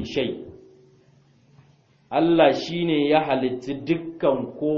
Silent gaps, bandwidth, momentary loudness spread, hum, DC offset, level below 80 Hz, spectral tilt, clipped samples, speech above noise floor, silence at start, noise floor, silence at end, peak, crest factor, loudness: none; 7 kHz; 12 LU; none; under 0.1%; -58 dBFS; -6.5 dB/octave; under 0.1%; 36 dB; 0 s; -58 dBFS; 0 s; -4 dBFS; 20 dB; -22 LUFS